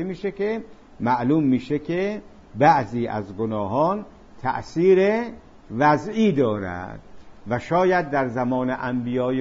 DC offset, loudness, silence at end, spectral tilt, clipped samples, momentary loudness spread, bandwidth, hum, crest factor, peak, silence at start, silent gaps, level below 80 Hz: under 0.1%; -22 LUFS; 0 s; -7.5 dB/octave; under 0.1%; 12 LU; 7.6 kHz; none; 18 dB; -4 dBFS; 0 s; none; -52 dBFS